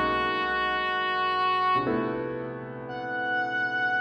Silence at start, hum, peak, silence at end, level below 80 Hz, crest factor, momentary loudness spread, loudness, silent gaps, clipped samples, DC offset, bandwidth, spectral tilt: 0 s; none; -14 dBFS; 0 s; -56 dBFS; 12 dB; 11 LU; -27 LUFS; none; under 0.1%; under 0.1%; 9 kHz; -6 dB/octave